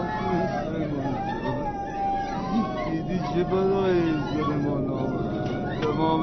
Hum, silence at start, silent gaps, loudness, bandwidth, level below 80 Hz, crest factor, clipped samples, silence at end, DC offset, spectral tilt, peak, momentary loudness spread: none; 0 s; none; -26 LUFS; 6.4 kHz; -42 dBFS; 16 dB; under 0.1%; 0 s; under 0.1%; -6.5 dB/octave; -10 dBFS; 6 LU